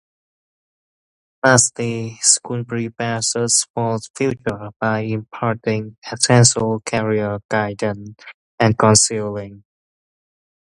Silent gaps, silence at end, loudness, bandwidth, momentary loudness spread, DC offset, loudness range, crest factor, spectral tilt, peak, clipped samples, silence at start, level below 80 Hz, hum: 3.70-3.74 s, 4.10-4.14 s, 4.76-4.80 s, 5.98-6.02 s, 7.45-7.49 s, 8.34-8.58 s; 1.2 s; -18 LUFS; 11.5 kHz; 13 LU; under 0.1%; 3 LU; 20 dB; -3.5 dB/octave; 0 dBFS; under 0.1%; 1.45 s; -52 dBFS; none